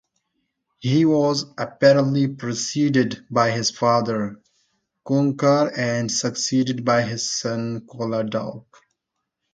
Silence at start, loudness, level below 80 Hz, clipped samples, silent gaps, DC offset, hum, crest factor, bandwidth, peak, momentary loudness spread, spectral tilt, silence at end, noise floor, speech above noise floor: 0.8 s; -21 LUFS; -64 dBFS; under 0.1%; none; under 0.1%; none; 18 dB; 9.4 kHz; -4 dBFS; 10 LU; -5 dB/octave; 0.95 s; -80 dBFS; 59 dB